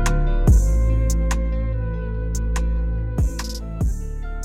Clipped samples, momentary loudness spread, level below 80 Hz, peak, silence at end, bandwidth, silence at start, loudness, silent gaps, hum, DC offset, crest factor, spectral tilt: under 0.1%; 9 LU; -20 dBFS; -6 dBFS; 0 s; 13 kHz; 0 s; -23 LUFS; none; none; under 0.1%; 12 dB; -6 dB/octave